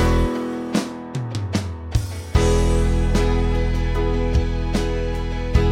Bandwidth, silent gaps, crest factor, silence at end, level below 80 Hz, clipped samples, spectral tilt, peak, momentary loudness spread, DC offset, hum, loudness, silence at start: 12.5 kHz; none; 16 dB; 0 s; -22 dBFS; under 0.1%; -6.5 dB/octave; -4 dBFS; 7 LU; under 0.1%; none; -22 LUFS; 0 s